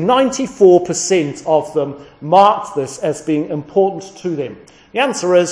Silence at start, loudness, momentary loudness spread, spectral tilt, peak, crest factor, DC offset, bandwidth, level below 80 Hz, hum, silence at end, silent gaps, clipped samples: 0 s; -16 LUFS; 14 LU; -4.5 dB/octave; 0 dBFS; 16 dB; under 0.1%; 10.5 kHz; -56 dBFS; none; 0 s; none; under 0.1%